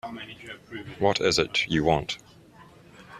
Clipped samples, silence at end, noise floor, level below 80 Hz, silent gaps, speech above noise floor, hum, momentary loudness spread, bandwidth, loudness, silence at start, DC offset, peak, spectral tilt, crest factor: under 0.1%; 0 s; -52 dBFS; -52 dBFS; none; 25 dB; none; 17 LU; 14 kHz; -25 LUFS; 0.05 s; under 0.1%; -6 dBFS; -4 dB/octave; 22 dB